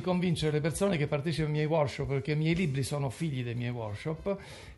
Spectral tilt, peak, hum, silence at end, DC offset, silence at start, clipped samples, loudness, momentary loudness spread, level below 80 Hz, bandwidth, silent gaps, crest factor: -6.5 dB/octave; -14 dBFS; none; 0.05 s; under 0.1%; 0 s; under 0.1%; -31 LUFS; 7 LU; -52 dBFS; 12 kHz; none; 16 dB